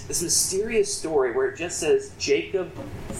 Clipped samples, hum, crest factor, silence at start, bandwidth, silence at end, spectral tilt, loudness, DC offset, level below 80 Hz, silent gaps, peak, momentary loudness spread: under 0.1%; none; 18 dB; 0 s; 15.5 kHz; 0 s; -2.5 dB/octave; -24 LUFS; under 0.1%; -46 dBFS; none; -6 dBFS; 9 LU